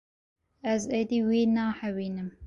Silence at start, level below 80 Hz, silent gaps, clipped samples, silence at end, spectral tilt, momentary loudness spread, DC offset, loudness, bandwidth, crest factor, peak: 0.65 s; -58 dBFS; none; under 0.1%; 0 s; -6 dB/octave; 9 LU; under 0.1%; -28 LUFS; 8 kHz; 14 dB; -16 dBFS